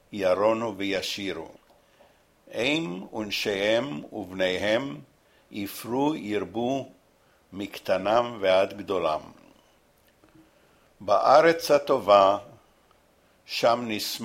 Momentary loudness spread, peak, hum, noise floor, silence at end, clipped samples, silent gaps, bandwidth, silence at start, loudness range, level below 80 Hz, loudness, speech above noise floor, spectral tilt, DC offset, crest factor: 18 LU; -4 dBFS; none; -62 dBFS; 0 s; under 0.1%; none; 16 kHz; 0.1 s; 7 LU; -64 dBFS; -25 LUFS; 37 dB; -4.5 dB/octave; under 0.1%; 22 dB